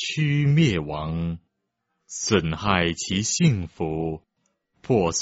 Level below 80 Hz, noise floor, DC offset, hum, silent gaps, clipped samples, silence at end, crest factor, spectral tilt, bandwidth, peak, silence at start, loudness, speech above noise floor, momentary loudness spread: -46 dBFS; -78 dBFS; under 0.1%; none; none; under 0.1%; 0 s; 20 dB; -5 dB/octave; 8 kHz; -4 dBFS; 0 s; -23 LUFS; 55 dB; 11 LU